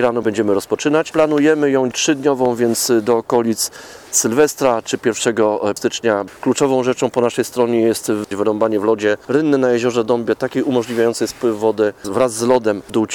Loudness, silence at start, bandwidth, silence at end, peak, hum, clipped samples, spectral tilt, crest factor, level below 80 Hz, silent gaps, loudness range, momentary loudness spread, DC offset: -17 LUFS; 0 s; 19 kHz; 0 s; 0 dBFS; none; under 0.1%; -4 dB/octave; 16 dB; -56 dBFS; none; 2 LU; 5 LU; under 0.1%